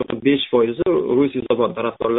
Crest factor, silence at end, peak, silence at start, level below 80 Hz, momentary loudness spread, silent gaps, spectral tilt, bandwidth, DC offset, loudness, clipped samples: 14 dB; 0 s; -4 dBFS; 0 s; -52 dBFS; 3 LU; none; -4.5 dB/octave; 4 kHz; under 0.1%; -19 LUFS; under 0.1%